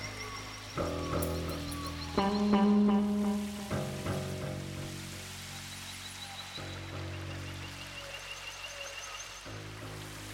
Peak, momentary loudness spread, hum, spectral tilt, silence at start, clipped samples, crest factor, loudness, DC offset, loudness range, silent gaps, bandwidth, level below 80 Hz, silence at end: -14 dBFS; 14 LU; none; -5 dB/octave; 0 s; under 0.1%; 20 dB; -35 LUFS; under 0.1%; 10 LU; none; 16.5 kHz; -52 dBFS; 0 s